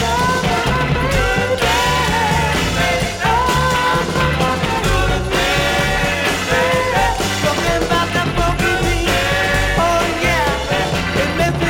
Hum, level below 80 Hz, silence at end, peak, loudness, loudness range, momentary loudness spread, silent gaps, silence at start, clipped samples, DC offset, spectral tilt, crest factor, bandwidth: none; -26 dBFS; 0 s; -4 dBFS; -16 LUFS; 1 LU; 2 LU; none; 0 s; under 0.1%; under 0.1%; -4 dB/octave; 12 dB; 19 kHz